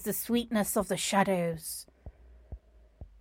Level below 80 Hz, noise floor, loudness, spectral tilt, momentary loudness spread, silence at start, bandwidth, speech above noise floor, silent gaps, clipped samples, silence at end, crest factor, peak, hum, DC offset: -54 dBFS; -52 dBFS; -30 LUFS; -4 dB/octave; 24 LU; 0 s; 16.5 kHz; 22 dB; none; under 0.1%; 0.15 s; 20 dB; -12 dBFS; none; under 0.1%